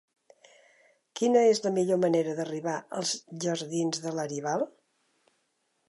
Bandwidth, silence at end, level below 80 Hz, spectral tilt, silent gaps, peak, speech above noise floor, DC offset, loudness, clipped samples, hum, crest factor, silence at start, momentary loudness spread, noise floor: 11.5 kHz; 1.2 s; -82 dBFS; -4.5 dB/octave; none; -10 dBFS; 48 dB; under 0.1%; -28 LUFS; under 0.1%; none; 18 dB; 1.15 s; 10 LU; -75 dBFS